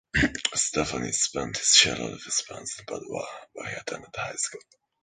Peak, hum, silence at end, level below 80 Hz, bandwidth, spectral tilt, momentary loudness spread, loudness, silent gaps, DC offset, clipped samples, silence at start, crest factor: -2 dBFS; none; 0.45 s; -48 dBFS; 11 kHz; -1.5 dB/octave; 18 LU; -25 LUFS; none; under 0.1%; under 0.1%; 0.15 s; 26 dB